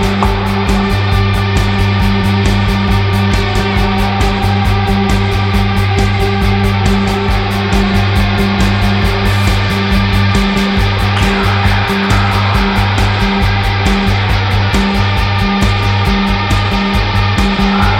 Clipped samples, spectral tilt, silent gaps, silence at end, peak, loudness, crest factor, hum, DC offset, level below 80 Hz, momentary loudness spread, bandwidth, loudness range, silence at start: under 0.1%; -6 dB/octave; none; 0 s; 0 dBFS; -12 LUFS; 10 dB; none; under 0.1%; -18 dBFS; 1 LU; 15.5 kHz; 1 LU; 0 s